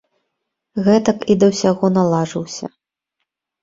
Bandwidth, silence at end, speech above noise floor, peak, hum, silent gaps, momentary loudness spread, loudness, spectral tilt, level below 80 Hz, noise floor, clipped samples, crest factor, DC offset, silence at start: 7.8 kHz; 0.95 s; 61 dB; -2 dBFS; none; none; 14 LU; -16 LUFS; -6.5 dB/octave; -54 dBFS; -77 dBFS; under 0.1%; 16 dB; under 0.1%; 0.75 s